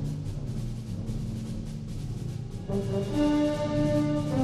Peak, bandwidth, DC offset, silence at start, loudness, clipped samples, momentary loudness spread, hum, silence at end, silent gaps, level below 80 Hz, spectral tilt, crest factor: -14 dBFS; 13 kHz; under 0.1%; 0 s; -30 LUFS; under 0.1%; 10 LU; none; 0 s; none; -40 dBFS; -7.5 dB/octave; 14 dB